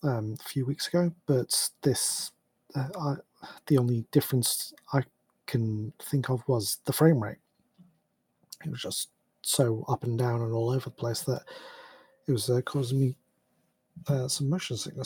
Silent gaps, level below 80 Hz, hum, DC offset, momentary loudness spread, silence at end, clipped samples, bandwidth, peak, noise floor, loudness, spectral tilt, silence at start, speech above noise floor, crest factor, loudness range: none; -68 dBFS; none; under 0.1%; 13 LU; 0 s; under 0.1%; over 20 kHz; -8 dBFS; -74 dBFS; -29 LUFS; -5 dB/octave; 0.05 s; 46 dB; 22 dB; 3 LU